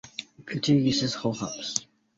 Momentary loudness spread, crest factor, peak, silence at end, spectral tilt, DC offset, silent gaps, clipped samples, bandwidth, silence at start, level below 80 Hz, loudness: 15 LU; 24 dB; -4 dBFS; 0.35 s; -4.5 dB/octave; under 0.1%; none; under 0.1%; 8 kHz; 0.05 s; -60 dBFS; -27 LUFS